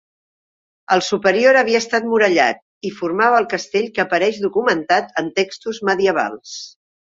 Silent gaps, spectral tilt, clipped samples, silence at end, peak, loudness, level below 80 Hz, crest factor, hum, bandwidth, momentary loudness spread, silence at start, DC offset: 2.62-2.81 s; -3.5 dB/octave; under 0.1%; 0.5 s; -2 dBFS; -17 LUFS; -62 dBFS; 18 dB; none; 7.8 kHz; 11 LU; 0.9 s; under 0.1%